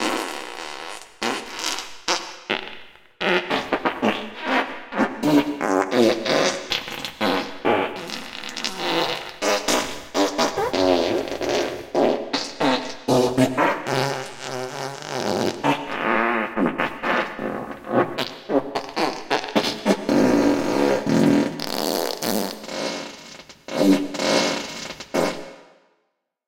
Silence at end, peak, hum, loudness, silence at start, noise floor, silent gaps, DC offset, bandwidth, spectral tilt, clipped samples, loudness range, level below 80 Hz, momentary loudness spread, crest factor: 0.85 s; -4 dBFS; none; -23 LUFS; 0 s; -73 dBFS; none; under 0.1%; 17 kHz; -4 dB/octave; under 0.1%; 4 LU; -56 dBFS; 11 LU; 18 dB